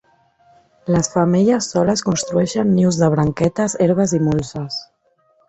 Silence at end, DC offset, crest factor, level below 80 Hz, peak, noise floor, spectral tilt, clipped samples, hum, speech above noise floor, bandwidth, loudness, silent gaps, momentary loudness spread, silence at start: 0.65 s; under 0.1%; 16 dB; -46 dBFS; -2 dBFS; -60 dBFS; -6 dB/octave; under 0.1%; none; 43 dB; 8.2 kHz; -17 LUFS; none; 10 LU; 0.85 s